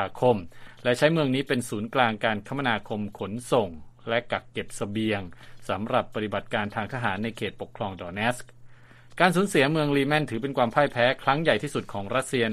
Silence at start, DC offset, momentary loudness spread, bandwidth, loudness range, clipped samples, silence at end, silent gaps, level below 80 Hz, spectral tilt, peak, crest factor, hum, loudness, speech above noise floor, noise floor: 0 s; under 0.1%; 12 LU; 15 kHz; 6 LU; under 0.1%; 0 s; none; -56 dBFS; -5.5 dB/octave; -4 dBFS; 22 dB; none; -26 LUFS; 22 dB; -48 dBFS